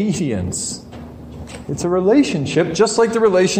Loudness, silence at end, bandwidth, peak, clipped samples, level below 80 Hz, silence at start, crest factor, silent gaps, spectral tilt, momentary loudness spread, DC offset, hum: -17 LUFS; 0 s; 15.5 kHz; -4 dBFS; under 0.1%; -44 dBFS; 0 s; 14 dB; none; -5 dB/octave; 20 LU; under 0.1%; none